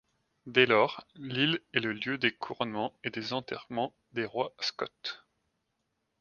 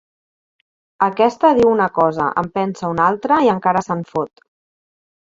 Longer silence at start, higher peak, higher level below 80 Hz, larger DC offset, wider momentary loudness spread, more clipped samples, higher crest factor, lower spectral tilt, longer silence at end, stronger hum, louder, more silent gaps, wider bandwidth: second, 0.45 s vs 1 s; second, -8 dBFS vs -2 dBFS; second, -74 dBFS vs -54 dBFS; neither; first, 12 LU vs 9 LU; neither; first, 24 dB vs 16 dB; second, -5 dB/octave vs -7 dB/octave; about the same, 1.05 s vs 0.95 s; neither; second, -31 LUFS vs -17 LUFS; neither; about the same, 7 kHz vs 7.6 kHz